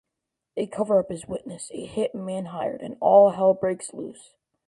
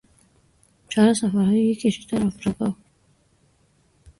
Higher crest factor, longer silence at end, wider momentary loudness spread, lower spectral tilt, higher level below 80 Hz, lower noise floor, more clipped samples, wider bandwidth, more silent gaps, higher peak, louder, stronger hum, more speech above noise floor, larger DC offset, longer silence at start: about the same, 20 dB vs 18 dB; second, 0.55 s vs 1.45 s; first, 19 LU vs 10 LU; about the same, -6 dB/octave vs -6 dB/octave; second, -64 dBFS vs -56 dBFS; first, -84 dBFS vs -62 dBFS; neither; about the same, 11.5 kHz vs 11.5 kHz; neither; about the same, -4 dBFS vs -6 dBFS; about the same, -23 LUFS vs -22 LUFS; neither; first, 60 dB vs 41 dB; neither; second, 0.55 s vs 0.9 s